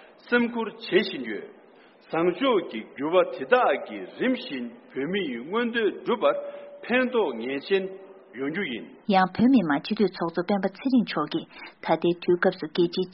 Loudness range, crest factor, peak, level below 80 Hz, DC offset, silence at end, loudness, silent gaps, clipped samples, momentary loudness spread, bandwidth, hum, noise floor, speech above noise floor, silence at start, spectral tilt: 2 LU; 22 dB; -4 dBFS; -68 dBFS; under 0.1%; 0 s; -26 LUFS; none; under 0.1%; 13 LU; 5.8 kHz; none; -54 dBFS; 28 dB; 0.25 s; -4 dB/octave